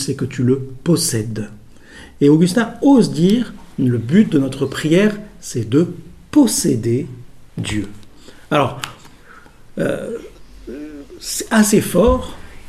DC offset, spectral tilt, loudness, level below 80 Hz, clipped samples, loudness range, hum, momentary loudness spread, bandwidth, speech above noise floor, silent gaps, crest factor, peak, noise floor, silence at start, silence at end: under 0.1%; -5.5 dB/octave; -17 LUFS; -38 dBFS; under 0.1%; 8 LU; none; 19 LU; 15.5 kHz; 26 dB; none; 16 dB; 0 dBFS; -42 dBFS; 0 s; 0 s